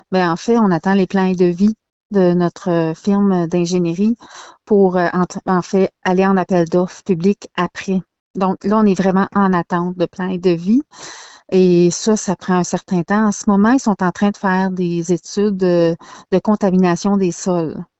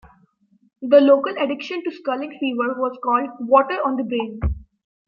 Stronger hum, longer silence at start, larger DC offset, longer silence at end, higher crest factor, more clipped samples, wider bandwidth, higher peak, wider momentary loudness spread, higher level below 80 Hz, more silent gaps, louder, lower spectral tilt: neither; second, 0.1 s vs 0.8 s; neither; second, 0.15 s vs 0.45 s; about the same, 14 dB vs 18 dB; neither; first, 8.2 kHz vs 6 kHz; about the same, -2 dBFS vs -2 dBFS; second, 7 LU vs 12 LU; second, -52 dBFS vs -38 dBFS; first, 1.92-2.10 s, 8.20-8.34 s vs none; first, -16 LUFS vs -20 LUFS; second, -6.5 dB/octave vs -8 dB/octave